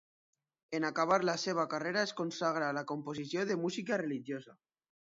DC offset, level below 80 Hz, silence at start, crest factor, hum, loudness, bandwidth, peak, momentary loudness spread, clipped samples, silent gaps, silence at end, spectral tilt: under 0.1%; -82 dBFS; 0.7 s; 22 dB; none; -35 LUFS; 7.4 kHz; -14 dBFS; 9 LU; under 0.1%; none; 0.5 s; -3.5 dB/octave